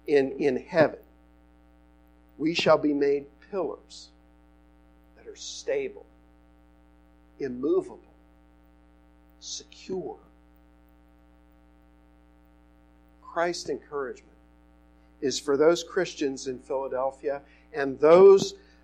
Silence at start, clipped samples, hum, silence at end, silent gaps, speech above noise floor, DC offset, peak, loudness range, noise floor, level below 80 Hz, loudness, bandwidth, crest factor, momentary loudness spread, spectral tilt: 0.05 s; under 0.1%; 60 Hz at -60 dBFS; 0.25 s; none; 33 dB; under 0.1%; -6 dBFS; 15 LU; -58 dBFS; -60 dBFS; -26 LUFS; 9.6 kHz; 22 dB; 18 LU; -4.5 dB/octave